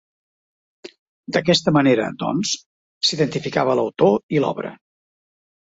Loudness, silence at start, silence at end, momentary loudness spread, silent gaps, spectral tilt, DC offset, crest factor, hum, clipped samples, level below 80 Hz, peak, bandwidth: -20 LUFS; 0.85 s; 1.05 s; 8 LU; 0.99-1.23 s, 2.66-3.01 s, 4.23-4.29 s; -4.5 dB/octave; under 0.1%; 18 dB; none; under 0.1%; -60 dBFS; -2 dBFS; 8.2 kHz